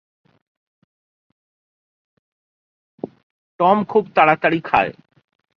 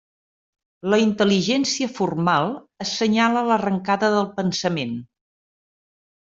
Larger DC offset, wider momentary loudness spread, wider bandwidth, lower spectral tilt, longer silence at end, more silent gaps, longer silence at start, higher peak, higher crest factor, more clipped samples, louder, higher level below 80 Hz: neither; first, 20 LU vs 9 LU; second, 6.2 kHz vs 7.8 kHz; first, -8 dB/octave vs -4.5 dB/octave; second, 0.65 s vs 1.2 s; first, 3.23-3.59 s vs none; first, 3.05 s vs 0.85 s; first, 0 dBFS vs -4 dBFS; about the same, 22 dB vs 18 dB; neither; first, -17 LUFS vs -21 LUFS; about the same, -58 dBFS vs -62 dBFS